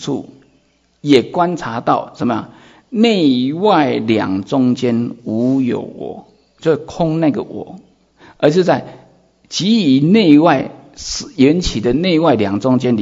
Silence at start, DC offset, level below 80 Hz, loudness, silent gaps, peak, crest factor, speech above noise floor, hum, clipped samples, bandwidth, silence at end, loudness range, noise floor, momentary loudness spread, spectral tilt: 0 s; under 0.1%; -42 dBFS; -15 LUFS; none; 0 dBFS; 16 dB; 42 dB; none; under 0.1%; 7.8 kHz; 0 s; 5 LU; -57 dBFS; 13 LU; -6 dB/octave